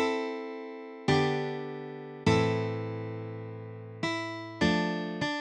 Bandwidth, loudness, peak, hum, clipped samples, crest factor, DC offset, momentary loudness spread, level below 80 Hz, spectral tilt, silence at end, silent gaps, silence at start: 10 kHz; -31 LUFS; -12 dBFS; none; under 0.1%; 20 dB; under 0.1%; 14 LU; -58 dBFS; -6 dB/octave; 0 s; none; 0 s